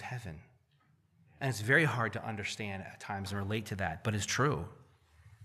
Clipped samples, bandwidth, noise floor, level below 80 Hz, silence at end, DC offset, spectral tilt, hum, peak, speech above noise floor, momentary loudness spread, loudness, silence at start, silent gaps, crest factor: under 0.1%; 15 kHz; -70 dBFS; -62 dBFS; 0 s; under 0.1%; -4.5 dB/octave; none; -14 dBFS; 36 dB; 16 LU; -34 LUFS; 0 s; none; 22 dB